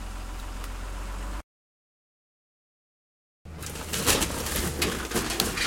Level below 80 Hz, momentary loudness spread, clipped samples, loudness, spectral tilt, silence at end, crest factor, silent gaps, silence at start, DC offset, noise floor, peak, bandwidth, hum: -40 dBFS; 15 LU; under 0.1%; -29 LUFS; -2.5 dB/octave; 0 s; 28 dB; 1.43-3.45 s; 0 s; under 0.1%; under -90 dBFS; -4 dBFS; 17 kHz; none